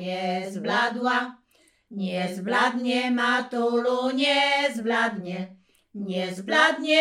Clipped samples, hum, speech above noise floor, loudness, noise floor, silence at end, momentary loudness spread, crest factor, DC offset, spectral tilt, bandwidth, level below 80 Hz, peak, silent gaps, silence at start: under 0.1%; none; 39 dB; -24 LUFS; -63 dBFS; 0 s; 14 LU; 18 dB; under 0.1%; -4 dB/octave; 14 kHz; -78 dBFS; -6 dBFS; none; 0 s